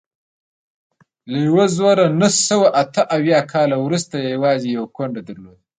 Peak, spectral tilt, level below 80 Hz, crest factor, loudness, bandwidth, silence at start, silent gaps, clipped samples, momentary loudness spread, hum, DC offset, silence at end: -2 dBFS; -4.5 dB/octave; -62 dBFS; 16 dB; -17 LUFS; 9.6 kHz; 1.25 s; none; under 0.1%; 12 LU; none; under 0.1%; 0.3 s